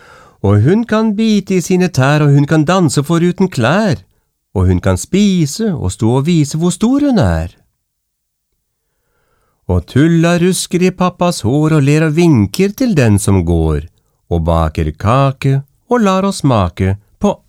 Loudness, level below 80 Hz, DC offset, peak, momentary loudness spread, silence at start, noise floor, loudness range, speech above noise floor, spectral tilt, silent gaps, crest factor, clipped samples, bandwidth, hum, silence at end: -13 LUFS; -32 dBFS; under 0.1%; 0 dBFS; 7 LU; 0.45 s; -70 dBFS; 5 LU; 58 dB; -6.5 dB/octave; none; 12 dB; under 0.1%; 16 kHz; none; 0.15 s